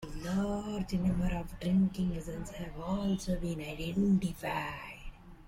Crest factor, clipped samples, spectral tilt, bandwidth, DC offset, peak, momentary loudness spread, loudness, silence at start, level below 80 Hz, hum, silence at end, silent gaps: 14 dB; under 0.1%; -7 dB/octave; 15.5 kHz; under 0.1%; -20 dBFS; 12 LU; -34 LUFS; 0 s; -46 dBFS; none; 0 s; none